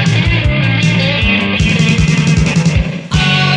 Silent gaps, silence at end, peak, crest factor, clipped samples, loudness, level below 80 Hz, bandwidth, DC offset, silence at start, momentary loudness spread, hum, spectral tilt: none; 0 s; 0 dBFS; 10 dB; under 0.1%; -12 LUFS; -22 dBFS; 10 kHz; under 0.1%; 0 s; 3 LU; none; -5.5 dB/octave